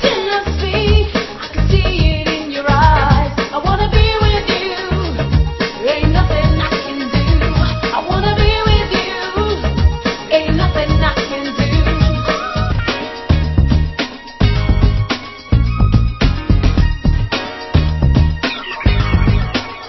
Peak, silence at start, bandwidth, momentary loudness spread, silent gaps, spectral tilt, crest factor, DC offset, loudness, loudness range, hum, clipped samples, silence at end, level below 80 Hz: 0 dBFS; 0 s; 6 kHz; 6 LU; none; -6.5 dB/octave; 14 dB; under 0.1%; -15 LUFS; 2 LU; none; under 0.1%; 0 s; -18 dBFS